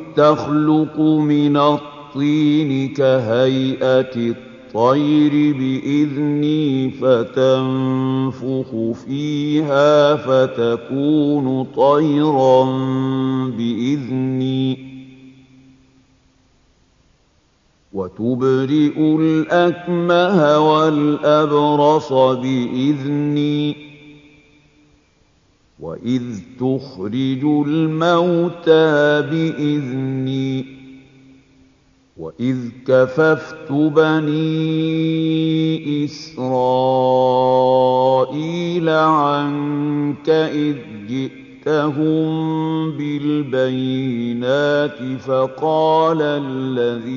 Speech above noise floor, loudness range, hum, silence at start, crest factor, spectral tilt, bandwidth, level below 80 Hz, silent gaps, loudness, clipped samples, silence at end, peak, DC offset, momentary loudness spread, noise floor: 42 dB; 8 LU; none; 0 s; 16 dB; -7.5 dB/octave; 7.2 kHz; -60 dBFS; none; -17 LUFS; under 0.1%; 0 s; 0 dBFS; under 0.1%; 9 LU; -58 dBFS